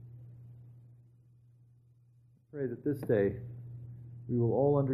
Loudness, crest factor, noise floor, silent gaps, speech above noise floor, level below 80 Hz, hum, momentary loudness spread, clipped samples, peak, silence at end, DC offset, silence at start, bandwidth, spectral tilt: -32 LUFS; 18 dB; -64 dBFS; none; 34 dB; -64 dBFS; none; 25 LU; under 0.1%; -16 dBFS; 0 s; under 0.1%; 0 s; 13 kHz; -10.5 dB/octave